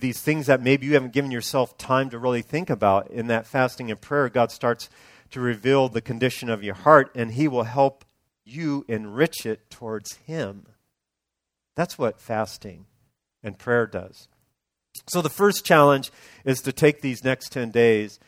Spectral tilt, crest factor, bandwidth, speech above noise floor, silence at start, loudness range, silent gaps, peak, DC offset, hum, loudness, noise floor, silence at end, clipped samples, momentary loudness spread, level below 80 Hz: -5.5 dB/octave; 24 dB; 16.5 kHz; 61 dB; 0 s; 9 LU; none; 0 dBFS; under 0.1%; none; -23 LUFS; -84 dBFS; 0.15 s; under 0.1%; 15 LU; -62 dBFS